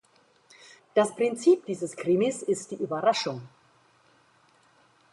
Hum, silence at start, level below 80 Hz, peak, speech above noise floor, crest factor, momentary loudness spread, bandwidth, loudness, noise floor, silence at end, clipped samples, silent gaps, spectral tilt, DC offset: none; 0.95 s; -76 dBFS; -8 dBFS; 37 dB; 20 dB; 10 LU; 11.5 kHz; -26 LUFS; -62 dBFS; 1.65 s; under 0.1%; none; -5 dB/octave; under 0.1%